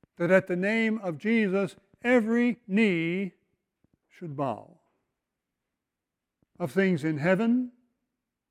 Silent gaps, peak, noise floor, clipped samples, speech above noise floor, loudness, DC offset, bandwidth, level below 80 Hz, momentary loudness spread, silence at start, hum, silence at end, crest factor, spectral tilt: none; -10 dBFS; -87 dBFS; under 0.1%; 61 dB; -27 LUFS; under 0.1%; 11.5 kHz; -74 dBFS; 13 LU; 0.2 s; none; 0.8 s; 20 dB; -7.5 dB/octave